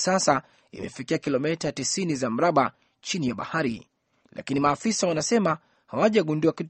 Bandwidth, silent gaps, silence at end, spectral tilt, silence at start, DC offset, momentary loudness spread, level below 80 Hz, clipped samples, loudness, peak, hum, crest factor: 8.8 kHz; none; 0 s; -4.5 dB/octave; 0 s; under 0.1%; 14 LU; -62 dBFS; under 0.1%; -25 LUFS; -6 dBFS; none; 20 dB